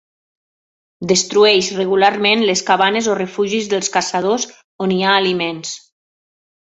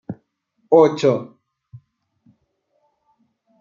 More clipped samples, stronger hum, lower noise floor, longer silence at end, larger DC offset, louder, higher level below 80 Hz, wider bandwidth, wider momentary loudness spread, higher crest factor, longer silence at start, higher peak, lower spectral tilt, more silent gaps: neither; neither; first, under -90 dBFS vs -68 dBFS; second, 0.9 s vs 2.35 s; neither; about the same, -15 LUFS vs -17 LUFS; first, -60 dBFS vs -68 dBFS; first, 8.2 kHz vs 7.4 kHz; second, 12 LU vs 24 LU; about the same, 16 dB vs 20 dB; first, 1 s vs 0.1 s; about the same, -2 dBFS vs -2 dBFS; second, -3 dB/octave vs -7 dB/octave; first, 4.64-4.79 s vs none